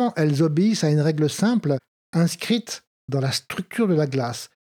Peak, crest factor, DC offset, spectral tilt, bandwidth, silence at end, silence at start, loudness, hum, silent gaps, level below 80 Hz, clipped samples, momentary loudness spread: -8 dBFS; 14 dB; under 0.1%; -6 dB/octave; 16.5 kHz; 0.25 s; 0 s; -22 LUFS; none; 1.88-2.13 s, 2.87-3.08 s; -70 dBFS; under 0.1%; 10 LU